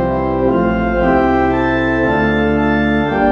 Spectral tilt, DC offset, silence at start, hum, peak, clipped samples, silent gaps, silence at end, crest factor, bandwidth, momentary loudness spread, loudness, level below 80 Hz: -8.5 dB/octave; under 0.1%; 0 s; none; -2 dBFS; under 0.1%; none; 0 s; 12 dB; 7 kHz; 2 LU; -14 LUFS; -28 dBFS